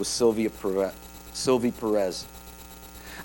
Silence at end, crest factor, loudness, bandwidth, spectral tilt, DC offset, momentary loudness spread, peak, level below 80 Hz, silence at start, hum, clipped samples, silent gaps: 0 s; 16 dB; -27 LUFS; over 20 kHz; -4 dB/octave; under 0.1%; 20 LU; -10 dBFS; -50 dBFS; 0 s; none; under 0.1%; none